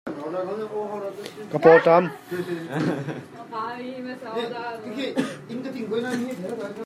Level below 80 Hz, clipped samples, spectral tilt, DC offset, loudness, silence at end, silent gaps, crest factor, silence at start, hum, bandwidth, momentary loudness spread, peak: -72 dBFS; under 0.1%; -6.5 dB/octave; under 0.1%; -25 LUFS; 0 s; none; 22 dB; 0.05 s; none; 14 kHz; 18 LU; -2 dBFS